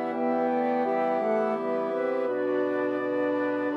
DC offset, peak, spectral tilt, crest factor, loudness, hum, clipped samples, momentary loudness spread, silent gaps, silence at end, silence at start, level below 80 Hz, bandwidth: under 0.1%; -16 dBFS; -7.5 dB/octave; 12 dB; -27 LUFS; none; under 0.1%; 2 LU; none; 0 s; 0 s; -88 dBFS; 6 kHz